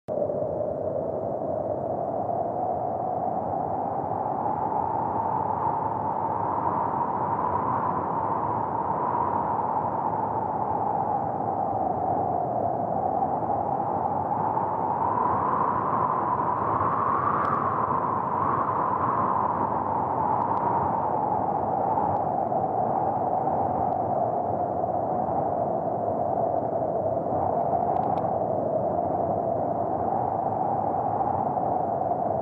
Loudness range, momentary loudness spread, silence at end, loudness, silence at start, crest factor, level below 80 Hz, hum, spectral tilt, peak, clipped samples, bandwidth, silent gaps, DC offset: 3 LU; 3 LU; 0 s; -26 LUFS; 0.1 s; 12 dB; -56 dBFS; none; -11 dB/octave; -12 dBFS; under 0.1%; 4 kHz; none; under 0.1%